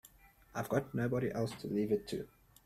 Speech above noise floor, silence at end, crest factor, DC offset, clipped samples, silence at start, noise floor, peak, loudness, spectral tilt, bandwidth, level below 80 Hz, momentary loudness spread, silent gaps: 27 dB; 0.4 s; 20 dB; under 0.1%; under 0.1%; 0.05 s; -62 dBFS; -18 dBFS; -37 LUFS; -7 dB/octave; 16 kHz; -64 dBFS; 9 LU; none